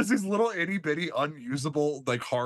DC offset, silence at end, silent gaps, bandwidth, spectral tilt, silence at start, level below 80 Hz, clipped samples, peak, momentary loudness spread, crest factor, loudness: under 0.1%; 0 s; none; 12.5 kHz; -5 dB/octave; 0 s; -72 dBFS; under 0.1%; -14 dBFS; 5 LU; 16 dB; -29 LUFS